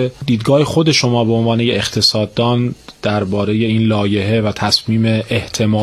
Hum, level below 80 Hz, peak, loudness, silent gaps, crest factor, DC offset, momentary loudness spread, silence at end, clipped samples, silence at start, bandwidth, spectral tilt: none; -44 dBFS; 0 dBFS; -15 LUFS; none; 14 dB; under 0.1%; 6 LU; 0 s; under 0.1%; 0 s; 13 kHz; -5.5 dB/octave